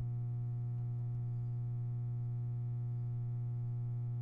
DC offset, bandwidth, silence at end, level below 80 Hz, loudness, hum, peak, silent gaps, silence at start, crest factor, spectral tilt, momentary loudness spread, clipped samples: under 0.1%; 1.4 kHz; 0 s; -60 dBFS; -40 LUFS; 60 Hz at -40 dBFS; -32 dBFS; none; 0 s; 6 dB; -12 dB/octave; 0 LU; under 0.1%